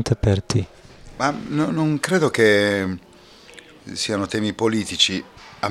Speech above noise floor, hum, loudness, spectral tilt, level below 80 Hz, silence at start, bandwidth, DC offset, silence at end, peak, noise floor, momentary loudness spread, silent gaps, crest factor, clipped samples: 26 dB; none; -21 LUFS; -4.5 dB/octave; -42 dBFS; 0 s; 14 kHz; under 0.1%; 0 s; -2 dBFS; -46 dBFS; 15 LU; none; 20 dB; under 0.1%